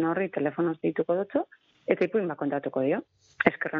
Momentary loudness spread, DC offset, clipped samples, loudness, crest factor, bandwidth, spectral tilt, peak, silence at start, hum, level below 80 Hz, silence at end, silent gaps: 6 LU; under 0.1%; under 0.1%; -28 LUFS; 22 dB; 6.6 kHz; -8.5 dB/octave; -6 dBFS; 0 s; none; -70 dBFS; 0 s; none